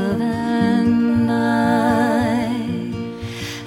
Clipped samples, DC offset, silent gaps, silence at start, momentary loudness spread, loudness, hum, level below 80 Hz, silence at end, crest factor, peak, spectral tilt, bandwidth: under 0.1%; under 0.1%; none; 0 s; 11 LU; -19 LUFS; none; -46 dBFS; 0 s; 12 dB; -6 dBFS; -6.5 dB/octave; 15 kHz